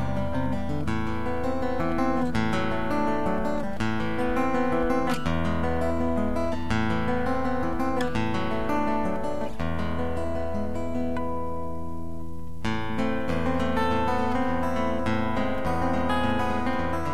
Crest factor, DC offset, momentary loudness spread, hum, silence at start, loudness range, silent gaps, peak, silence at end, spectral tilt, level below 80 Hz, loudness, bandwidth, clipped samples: 16 dB; 4%; 5 LU; none; 0 s; 4 LU; none; -10 dBFS; 0 s; -7 dB/octave; -40 dBFS; -28 LUFS; 14 kHz; under 0.1%